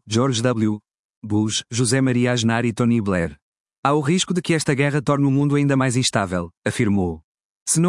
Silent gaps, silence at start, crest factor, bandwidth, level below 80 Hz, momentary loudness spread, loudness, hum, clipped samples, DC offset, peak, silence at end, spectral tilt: 0.99-1.22 s, 3.42-3.52 s, 3.60-3.65 s, 3.78-3.83 s, 6.57-6.62 s, 7.24-7.38 s, 7.44-7.66 s; 0.05 s; 18 dB; 12 kHz; -54 dBFS; 7 LU; -20 LUFS; none; under 0.1%; under 0.1%; -2 dBFS; 0 s; -5 dB/octave